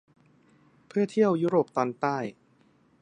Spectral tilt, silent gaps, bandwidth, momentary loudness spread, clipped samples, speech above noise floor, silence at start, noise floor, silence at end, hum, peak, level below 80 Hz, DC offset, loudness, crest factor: -7.5 dB/octave; none; 9.8 kHz; 10 LU; under 0.1%; 37 dB; 0.95 s; -63 dBFS; 0.7 s; none; -10 dBFS; -76 dBFS; under 0.1%; -27 LUFS; 20 dB